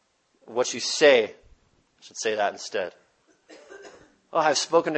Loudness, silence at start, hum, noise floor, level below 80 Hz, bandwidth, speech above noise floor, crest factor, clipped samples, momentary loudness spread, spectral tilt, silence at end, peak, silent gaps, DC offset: -24 LUFS; 0.5 s; none; -62 dBFS; -70 dBFS; 8.8 kHz; 39 dB; 22 dB; under 0.1%; 19 LU; -2 dB/octave; 0 s; -4 dBFS; none; under 0.1%